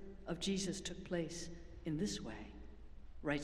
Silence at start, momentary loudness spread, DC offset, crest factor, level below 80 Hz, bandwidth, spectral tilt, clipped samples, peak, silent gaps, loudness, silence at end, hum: 0 s; 18 LU; under 0.1%; 20 dB; -56 dBFS; 13.5 kHz; -4.5 dB/octave; under 0.1%; -22 dBFS; none; -43 LUFS; 0 s; none